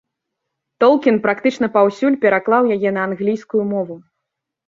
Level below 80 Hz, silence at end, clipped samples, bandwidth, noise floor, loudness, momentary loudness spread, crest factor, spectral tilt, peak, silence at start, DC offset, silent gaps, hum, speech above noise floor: -64 dBFS; 0.7 s; under 0.1%; 7.6 kHz; -80 dBFS; -17 LUFS; 7 LU; 16 dB; -7 dB/octave; -2 dBFS; 0.8 s; under 0.1%; none; none; 64 dB